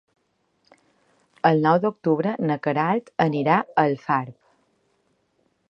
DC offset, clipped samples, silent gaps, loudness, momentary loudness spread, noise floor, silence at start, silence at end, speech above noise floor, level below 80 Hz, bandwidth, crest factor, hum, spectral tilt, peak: under 0.1%; under 0.1%; none; -22 LUFS; 5 LU; -70 dBFS; 1.45 s; 1.4 s; 48 dB; -72 dBFS; 6.6 kHz; 22 dB; none; -8.5 dB/octave; -2 dBFS